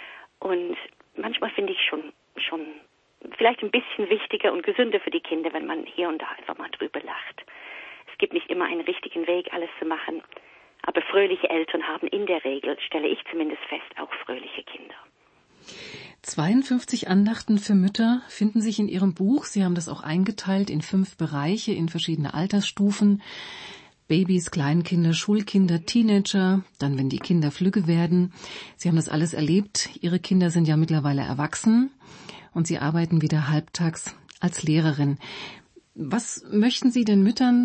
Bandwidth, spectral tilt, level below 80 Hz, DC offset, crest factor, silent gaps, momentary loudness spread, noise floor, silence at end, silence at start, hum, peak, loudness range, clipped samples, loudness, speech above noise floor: 8.8 kHz; -5.5 dB/octave; -64 dBFS; under 0.1%; 18 dB; none; 15 LU; -61 dBFS; 0 s; 0 s; none; -6 dBFS; 7 LU; under 0.1%; -24 LUFS; 37 dB